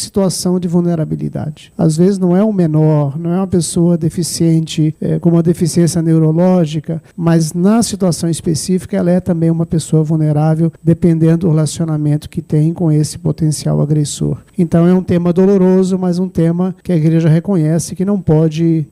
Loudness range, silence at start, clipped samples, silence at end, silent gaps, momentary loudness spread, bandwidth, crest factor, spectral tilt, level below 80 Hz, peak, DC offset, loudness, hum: 2 LU; 0 s; under 0.1%; 0.05 s; none; 6 LU; 13 kHz; 12 dB; -7 dB/octave; -44 dBFS; 0 dBFS; under 0.1%; -13 LUFS; none